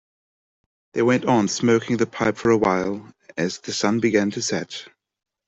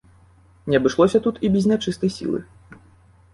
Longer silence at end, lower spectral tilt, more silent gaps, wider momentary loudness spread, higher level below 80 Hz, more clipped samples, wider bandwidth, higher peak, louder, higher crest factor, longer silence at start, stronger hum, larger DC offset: about the same, 0.6 s vs 0.6 s; second, -5 dB/octave vs -6.5 dB/octave; neither; about the same, 12 LU vs 10 LU; second, -58 dBFS vs -52 dBFS; neither; second, 8.2 kHz vs 11.5 kHz; about the same, -4 dBFS vs -4 dBFS; about the same, -21 LUFS vs -20 LUFS; about the same, 18 dB vs 18 dB; first, 0.95 s vs 0.65 s; neither; neither